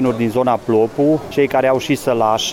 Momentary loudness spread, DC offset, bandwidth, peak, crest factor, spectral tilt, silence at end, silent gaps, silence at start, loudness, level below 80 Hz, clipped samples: 2 LU; under 0.1%; 17 kHz; -4 dBFS; 12 dB; -5 dB/octave; 0 s; none; 0 s; -16 LUFS; -50 dBFS; under 0.1%